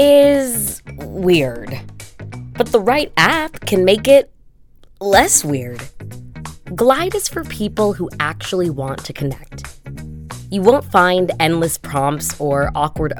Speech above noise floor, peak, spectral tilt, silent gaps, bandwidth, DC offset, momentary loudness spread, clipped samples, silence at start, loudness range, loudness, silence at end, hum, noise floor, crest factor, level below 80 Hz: 30 dB; 0 dBFS; -4 dB/octave; none; 19 kHz; under 0.1%; 20 LU; under 0.1%; 0 s; 5 LU; -16 LUFS; 0 s; none; -45 dBFS; 16 dB; -38 dBFS